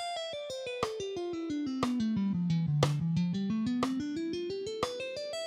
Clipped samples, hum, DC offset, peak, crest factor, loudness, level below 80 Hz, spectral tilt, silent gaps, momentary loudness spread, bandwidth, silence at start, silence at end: under 0.1%; none; under 0.1%; -10 dBFS; 22 dB; -33 LUFS; -62 dBFS; -6.5 dB/octave; none; 7 LU; 13 kHz; 0 s; 0 s